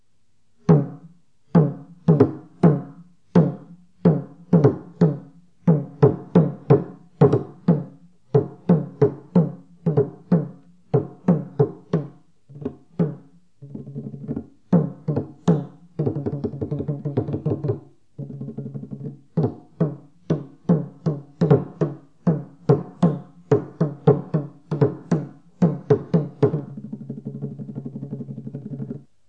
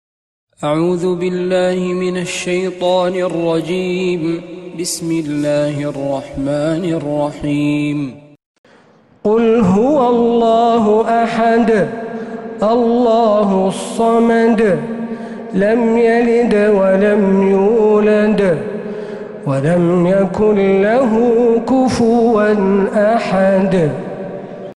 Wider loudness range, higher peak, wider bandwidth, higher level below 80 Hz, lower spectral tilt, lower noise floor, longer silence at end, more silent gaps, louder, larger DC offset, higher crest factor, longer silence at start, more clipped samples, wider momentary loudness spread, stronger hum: about the same, 7 LU vs 6 LU; about the same, -2 dBFS vs -2 dBFS; second, 6.4 kHz vs 12 kHz; second, -58 dBFS vs -46 dBFS; first, -10.5 dB/octave vs -6.5 dB/octave; first, -69 dBFS vs -48 dBFS; first, 0.3 s vs 0.05 s; second, none vs 8.46-8.64 s; second, -22 LUFS vs -14 LUFS; first, 0.2% vs under 0.1%; first, 22 dB vs 12 dB; about the same, 0.7 s vs 0.6 s; neither; first, 16 LU vs 11 LU; neither